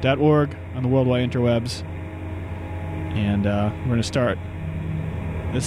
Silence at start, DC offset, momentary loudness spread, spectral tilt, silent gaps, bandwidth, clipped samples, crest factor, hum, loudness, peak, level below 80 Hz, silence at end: 0 s; under 0.1%; 12 LU; -7 dB/octave; none; 13 kHz; under 0.1%; 16 dB; none; -24 LUFS; -6 dBFS; -40 dBFS; 0 s